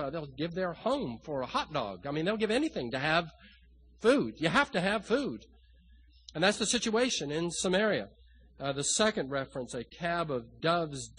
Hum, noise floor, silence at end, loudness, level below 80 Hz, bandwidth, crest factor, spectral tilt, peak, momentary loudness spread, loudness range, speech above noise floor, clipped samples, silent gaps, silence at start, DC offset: none; -59 dBFS; 0.05 s; -31 LUFS; -58 dBFS; 10 kHz; 22 dB; -3.5 dB/octave; -10 dBFS; 10 LU; 2 LU; 28 dB; under 0.1%; none; 0 s; under 0.1%